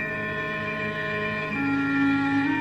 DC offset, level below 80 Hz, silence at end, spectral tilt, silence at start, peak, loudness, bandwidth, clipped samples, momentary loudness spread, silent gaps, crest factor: under 0.1%; -54 dBFS; 0 s; -7 dB/octave; 0 s; -12 dBFS; -25 LUFS; 8 kHz; under 0.1%; 5 LU; none; 12 dB